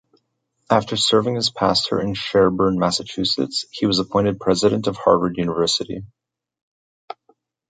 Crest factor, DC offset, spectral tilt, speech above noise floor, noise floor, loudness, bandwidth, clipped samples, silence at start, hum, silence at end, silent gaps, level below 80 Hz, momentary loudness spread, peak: 18 dB; under 0.1%; -4.5 dB/octave; 51 dB; -70 dBFS; -19 LUFS; 9.4 kHz; under 0.1%; 0.7 s; none; 1.65 s; none; -50 dBFS; 7 LU; -2 dBFS